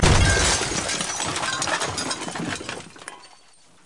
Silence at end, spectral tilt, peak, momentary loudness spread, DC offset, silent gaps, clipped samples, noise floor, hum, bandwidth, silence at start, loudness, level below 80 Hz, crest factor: 0.6 s; -3 dB/octave; -8 dBFS; 18 LU; 0.2%; none; under 0.1%; -55 dBFS; none; 11.5 kHz; 0 s; -22 LUFS; -32 dBFS; 16 dB